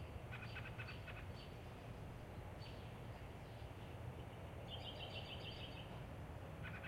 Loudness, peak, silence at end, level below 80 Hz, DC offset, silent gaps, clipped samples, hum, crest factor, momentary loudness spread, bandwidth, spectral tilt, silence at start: -52 LUFS; -36 dBFS; 0 s; -60 dBFS; under 0.1%; none; under 0.1%; none; 14 dB; 5 LU; 16 kHz; -6 dB/octave; 0 s